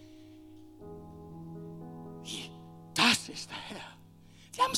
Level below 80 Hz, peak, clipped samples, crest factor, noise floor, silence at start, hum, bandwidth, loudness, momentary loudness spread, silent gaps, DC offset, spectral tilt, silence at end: -66 dBFS; -8 dBFS; under 0.1%; 28 dB; -56 dBFS; 0 s; none; 17.5 kHz; -31 LUFS; 28 LU; none; under 0.1%; -2 dB/octave; 0 s